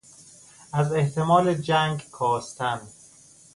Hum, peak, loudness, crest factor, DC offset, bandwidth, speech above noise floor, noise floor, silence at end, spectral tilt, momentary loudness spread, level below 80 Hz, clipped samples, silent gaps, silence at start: none; -6 dBFS; -24 LUFS; 20 dB; under 0.1%; 11.5 kHz; 29 dB; -52 dBFS; 0.65 s; -6 dB/octave; 9 LU; -60 dBFS; under 0.1%; none; 0.75 s